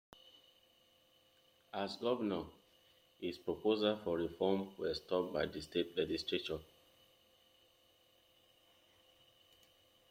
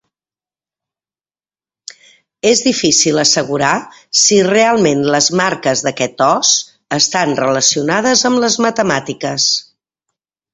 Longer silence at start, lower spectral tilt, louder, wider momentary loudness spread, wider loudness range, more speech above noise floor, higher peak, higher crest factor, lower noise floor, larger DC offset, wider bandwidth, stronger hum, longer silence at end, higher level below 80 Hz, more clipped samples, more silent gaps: second, 1.75 s vs 2.45 s; first, -6 dB/octave vs -2.5 dB/octave; second, -39 LUFS vs -13 LUFS; first, 11 LU vs 6 LU; first, 7 LU vs 3 LU; second, 33 dB vs over 77 dB; second, -20 dBFS vs 0 dBFS; first, 22 dB vs 14 dB; second, -71 dBFS vs under -90 dBFS; neither; first, 16.5 kHz vs 8.4 kHz; neither; first, 3.45 s vs 0.9 s; second, -72 dBFS vs -56 dBFS; neither; neither